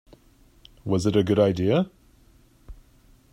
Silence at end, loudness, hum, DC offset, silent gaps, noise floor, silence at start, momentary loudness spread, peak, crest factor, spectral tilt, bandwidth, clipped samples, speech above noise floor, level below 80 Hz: 0.6 s; -23 LUFS; none; under 0.1%; none; -56 dBFS; 0.85 s; 11 LU; -6 dBFS; 20 dB; -7 dB/octave; 14 kHz; under 0.1%; 35 dB; -52 dBFS